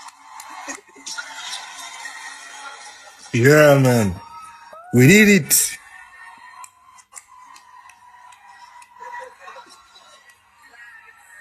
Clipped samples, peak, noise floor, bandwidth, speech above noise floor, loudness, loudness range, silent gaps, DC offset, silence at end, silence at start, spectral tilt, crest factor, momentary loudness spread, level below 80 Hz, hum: under 0.1%; 0 dBFS; -51 dBFS; 15.5 kHz; 38 dB; -15 LUFS; 12 LU; none; under 0.1%; 2.15 s; 0.05 s; -4.5 dB/octave; 20 dB; 29 LU; -54 dBFS; none